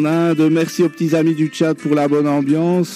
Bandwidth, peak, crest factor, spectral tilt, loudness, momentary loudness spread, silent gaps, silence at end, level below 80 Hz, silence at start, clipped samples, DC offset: 15 kHz; -4 dBFS; 12 dB; -7 dB/octave; -16 LUFS; 3 LU; none; 0 s; -70 dBFS; 0 s; under 0.1%; under 0.1%